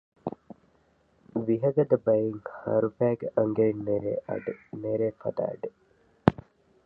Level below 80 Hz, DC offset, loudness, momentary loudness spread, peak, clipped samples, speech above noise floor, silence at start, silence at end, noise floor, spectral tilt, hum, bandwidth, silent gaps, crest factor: -58 dBFS; under 0.1%; -28 LUFS; 15 LU; 0 dBFS; under 0.1%; 38 dB; 0.25 s; 0.55 s; -65 dBFS; -10.5 dB/octave; none; 5.2 kHz; none; 28 dB